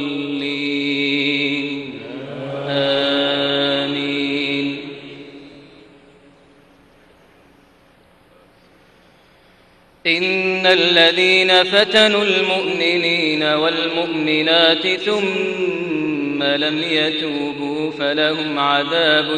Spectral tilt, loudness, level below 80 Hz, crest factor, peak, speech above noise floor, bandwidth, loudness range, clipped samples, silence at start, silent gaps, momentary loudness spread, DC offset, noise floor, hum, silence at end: -4 dB/octave; -16 LUFS; -60 dBFS; 18 dB; -2 dBFS; 35 dB; 10.5 kHz; 11 LU; under 0.1%; 0 s; none; 11 LU; under 0.1%; -52 dBFS; none; 0 s